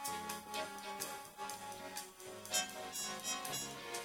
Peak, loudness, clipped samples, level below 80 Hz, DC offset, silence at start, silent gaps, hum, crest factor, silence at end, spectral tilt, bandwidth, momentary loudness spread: -20 dBFS; -42 LUFS; under 0.1%; -76 dBFS; under 0.1%; 0 s; none; none; 24 dB; 0 s; -1 dB/octave; 19 kHz; 9 LU